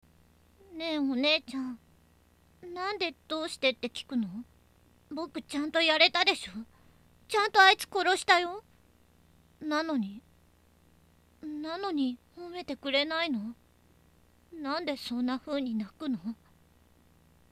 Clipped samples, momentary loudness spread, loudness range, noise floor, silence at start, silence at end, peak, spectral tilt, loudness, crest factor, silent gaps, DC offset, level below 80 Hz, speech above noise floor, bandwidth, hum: under 0.1%; 21 LU; 10 LU; -63 dBFS; 0.7 s; 1.2 s; -6 dBFS; -3 dB/octave; -29 LUFS; 26 dB; none; under 0.1%; -68 dBFS; 34 dB; 15.5 kHz; 60 Hz at -65 dBFS